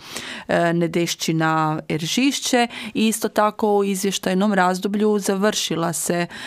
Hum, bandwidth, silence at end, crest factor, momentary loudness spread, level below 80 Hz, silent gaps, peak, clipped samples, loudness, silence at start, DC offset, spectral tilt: none; 16 kHz; 0 s; 16 dB; 4 LU; -62 dBFS; none; -4 dBFS; under 0.1%; -20 LUFS; 0 s; under 0.1%; -4 dB/octave